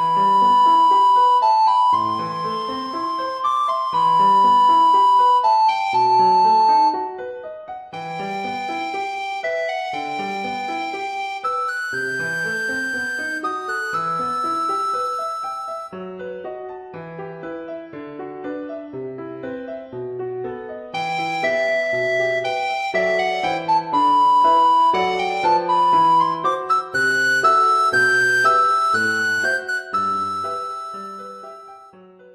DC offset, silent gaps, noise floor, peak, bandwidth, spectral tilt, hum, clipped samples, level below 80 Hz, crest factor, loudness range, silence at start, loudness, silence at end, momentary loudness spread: under 0.1%; none; -45 dBFS; -4 dBFS; 13.5 kHz; -3.5 dB/octave; none; under 0.1%; -62 dBFS; 14 dB; 14 LU; 0 s; -18 LUFS; 0.45 s; 18 LU